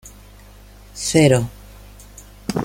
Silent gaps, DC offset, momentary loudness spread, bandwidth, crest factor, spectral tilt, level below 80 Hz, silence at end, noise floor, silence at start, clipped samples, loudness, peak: none; under 0.1%; 27 LU; 16.5 kHz; 20 dB; -5 dB/octave; -44 dBFS; 0 s; -43 dBFS; 0.05 s; under 0.1%; -18 LUFS; -2 dBFS